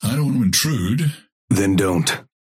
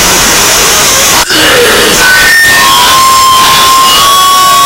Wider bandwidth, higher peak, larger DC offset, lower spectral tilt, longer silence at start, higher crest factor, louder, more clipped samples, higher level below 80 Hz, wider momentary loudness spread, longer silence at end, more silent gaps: second, 16.5 kHz vs over 20 kHz; second, -6 dBFS vs 0 dBFS; second, under 0.1% vs 0.6%; first, -4.5 dB/octave vs -0.5 dB/octave; about the same, 0 s vs 0 s; first, 14 dB vs 4 dB; second, -19 LUFS vs -2 LUFS; second, under 0.1% vs 4%; second, -50 dBFS vs -28 dBFS; first, 5 LU vs 2 LU; first, 0.2 s vs 0 s; first, 1.32-1.48 s vs none